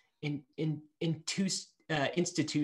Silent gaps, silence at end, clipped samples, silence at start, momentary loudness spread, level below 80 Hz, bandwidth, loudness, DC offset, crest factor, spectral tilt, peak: none; 0 s; under 0.1%; 0.2 s; 7 LU; -72 dBFS; 12 kHz; -35 LUFS; under 0.1%; 18 dB; -4.5 dB/octave; -16 dBFS